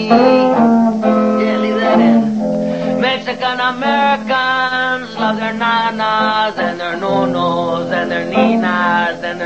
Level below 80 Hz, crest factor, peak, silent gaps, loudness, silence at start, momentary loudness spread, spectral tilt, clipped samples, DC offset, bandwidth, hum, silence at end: -54 dBFS; 14 dB; 0 dBFS; none; -14 LUFS; 0 s; 7 LU; -6 dB/octave; under 0.1%; 0.4%; 8 kHz; none; 0 s